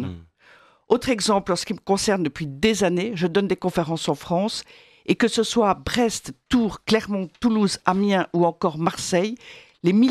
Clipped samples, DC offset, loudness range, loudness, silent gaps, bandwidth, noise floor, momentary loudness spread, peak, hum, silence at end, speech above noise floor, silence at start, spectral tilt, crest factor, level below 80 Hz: under 0.1%; under 0.1%; 1 LU; -22 LUFS; none; 14 kHz; -54 dBFS; 7 LU; -2 dBFS; none; 0 s; 32 dB; 0 s; -5 dB/octave; 20 dB; -50 dBFS